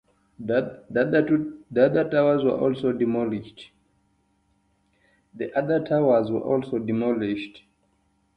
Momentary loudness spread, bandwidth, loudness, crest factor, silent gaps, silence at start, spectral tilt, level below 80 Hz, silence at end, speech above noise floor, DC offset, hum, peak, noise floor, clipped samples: 10 LU; 5.2 kHz; -24 LUFS; 18 dB; none; 0.4 s; -9 dB/octave; -62 dBFS; 0.8 s; 44 dB; under 0.1%; none; -6 dBFS; -67 dBFS; under 0.1%